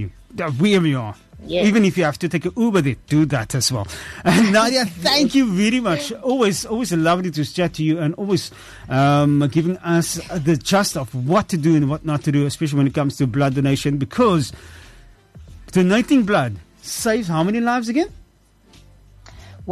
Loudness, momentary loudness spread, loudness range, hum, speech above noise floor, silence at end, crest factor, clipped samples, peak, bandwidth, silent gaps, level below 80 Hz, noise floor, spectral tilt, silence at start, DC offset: -19 LUFS; 9 LU; 3 LU; none; 36 dB; 0 s; 14 dB; under 0.1%; -4 dBFS; 13 kHz; none; -46 dBFS; -54 dBFS; -5.5 dB/octave; 0 s; under 0.1%